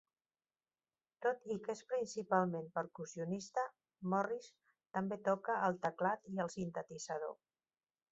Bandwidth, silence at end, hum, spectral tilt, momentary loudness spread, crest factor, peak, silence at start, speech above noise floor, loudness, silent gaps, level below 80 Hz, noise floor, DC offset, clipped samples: 8 kHz; 0.8 s; none; -5.5 dB/octave; 10 LU; 22 dB; -18 dBFS; 1.2 s; over 51 dB; -40 LUFS; none; -80 dBFS; under -90 dBFS; under 0.1%; under 0.1%